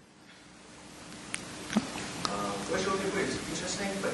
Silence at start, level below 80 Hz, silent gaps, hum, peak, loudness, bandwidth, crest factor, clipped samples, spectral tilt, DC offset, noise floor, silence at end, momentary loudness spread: 0 s; -58 dBFS; none; none; -8 dBFS; -33 LUFS; 11.5 kHz; 26 dB; under 0.1%; -3.5 dB/octave; under 0.1%; -54 dBFS; 0 s; 20 LU